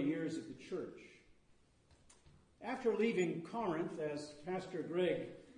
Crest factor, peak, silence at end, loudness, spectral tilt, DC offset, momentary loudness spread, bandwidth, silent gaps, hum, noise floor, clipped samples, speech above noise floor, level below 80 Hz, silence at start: 18 dB; -24 dBFS; 0 s; -40 LUFS; -6 dB/octave; under 0.1%; 12 LU; 10 kHz; none; none; -70 dBFS; under 0.1%; 31 dB; -74 dBFS; 0 s